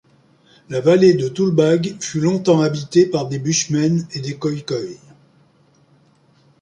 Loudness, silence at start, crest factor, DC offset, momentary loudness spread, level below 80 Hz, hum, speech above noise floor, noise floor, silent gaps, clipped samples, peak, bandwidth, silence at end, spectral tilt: -18 LUFS; 0.7 s; 16 dB; under 0.1%; 12 LU; -60 dBFS; none; 38 dB; -55 dBFS; none; under 0.1%; -2 dBFS; 10.5 kHz; 1.65 s; -5.5 dB/octave